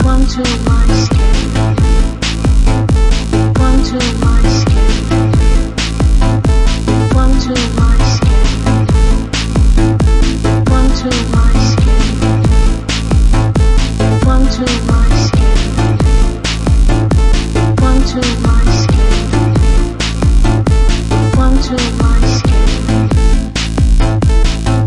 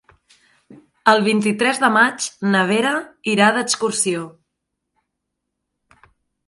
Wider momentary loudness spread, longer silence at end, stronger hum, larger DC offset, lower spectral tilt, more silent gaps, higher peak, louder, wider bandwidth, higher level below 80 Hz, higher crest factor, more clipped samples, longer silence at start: second, 3 LU vs 8 LU; second, 0 s vs 2.15 s; neither; first, 0.8% vs under 0.1%; first, -6 dB/octave vs -3.5 dB/octave; neither; about the same, 0 dBFS vs 0 dBFS; first, -12 LUFS vs -17 LUFS; about the same, 11.5 kHz vs 11.5 kHz; first, -12 dBFS vs -68 dBFS; second, 10 dB vs 20 dB; neither; second, 0 s vs 0.7 s